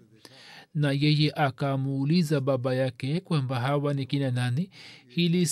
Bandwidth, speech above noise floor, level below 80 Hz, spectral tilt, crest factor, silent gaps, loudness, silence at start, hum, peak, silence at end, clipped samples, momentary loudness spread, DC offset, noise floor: 13.5 kHz; 26 dB; -70 dBFS; -6 dB/octave; 14 dB; none; -27 LUFS; 0.4 s; none; -12 dBFS; 0 s; under 0.1%; 9 LU; under 0.1%; -52 dBFS